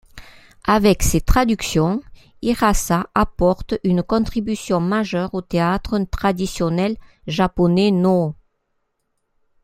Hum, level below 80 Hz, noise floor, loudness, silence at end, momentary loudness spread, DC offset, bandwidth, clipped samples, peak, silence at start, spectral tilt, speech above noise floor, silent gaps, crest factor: none; -30 dBFS; -71 dBFS; -19 LUFS; 1.3 s; 8 LU; under 0.1%; 16 kHz; under 0.1%; 0 dBFS; 0.15 s; -5.5 dB/octave; 53 dB; none; 18 dB